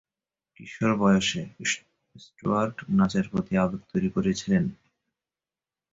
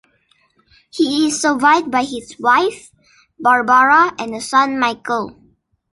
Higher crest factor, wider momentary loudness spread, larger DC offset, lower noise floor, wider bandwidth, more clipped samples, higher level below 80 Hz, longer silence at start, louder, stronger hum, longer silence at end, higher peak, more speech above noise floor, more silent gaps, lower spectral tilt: about the same, 18 dB vs 16 dB; second, 8 LU vs 11 LU; neither; first, under -90 dBFS vs -59 dBFS; second, 7.8 kHz vs 11.5 kHz; neither; about the same, -54 dBFS vs -58 dBFS; second, 0.6 s vs 0.95 s; second, -26 LUFS vs -15 LUFS; neither; first, 1.2 s vs 0.6 s; second, -10 dBFS vs -2 dBFS; first, over 65 dB vs 44 dB; neither; first, -5.5 dB/octave vs -2.5 dB/octave